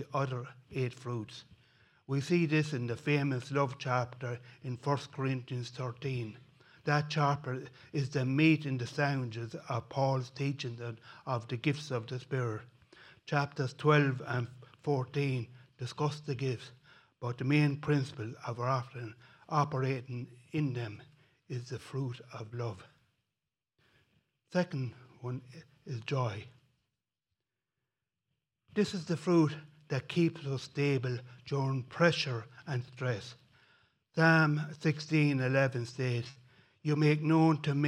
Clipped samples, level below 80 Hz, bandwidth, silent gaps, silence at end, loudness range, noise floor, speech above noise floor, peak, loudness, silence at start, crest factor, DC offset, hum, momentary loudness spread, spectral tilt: under 0.1%; -74 dBFS; 10.5 kHz; none; 0 s; 10 LU; under -90 dBFS; over 57 dB; -10 dBFS; -33 LUFS; 0 s; 24 dB; under 0.1%; none; 15 LU; -7 dB/octave